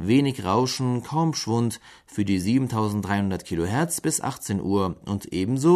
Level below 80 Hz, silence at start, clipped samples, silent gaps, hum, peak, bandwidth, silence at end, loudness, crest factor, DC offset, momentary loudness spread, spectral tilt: -54 dBFS; 0 s; under 0.1%; none; none; -6 dBFS; 13.5 kHz; 0 s; -25 LUFS; 16 dB; under 0.1%; 6 LU; -5.5 dB/octave